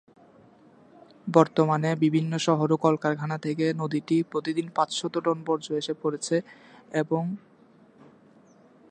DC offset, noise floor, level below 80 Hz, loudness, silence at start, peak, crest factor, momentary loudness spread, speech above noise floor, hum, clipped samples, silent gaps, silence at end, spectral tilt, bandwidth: under 0.1%; -56 dBFS; -76 dBFS; -26 LUFS; 1.25 s; -4 dBFS; 24 dB; 7 LU; 31 dB; none; under 0.1%; none; 1.5 s; -6 dB/octave; 9.8 kHz